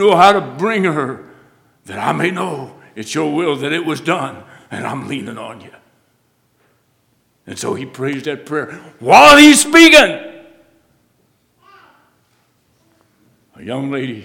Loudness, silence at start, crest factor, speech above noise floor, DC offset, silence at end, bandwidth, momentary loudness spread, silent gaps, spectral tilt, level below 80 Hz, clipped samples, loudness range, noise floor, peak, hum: -12 LUFS; 0 s; 16 dB; 48 dB; under 0.1%; 0 s; 18.5 kHz; 25 LU; none; -3.5 dB/octave; -48 dBFS; 0.4%; 20 LU; -60 dBFS; 0 dBFS; none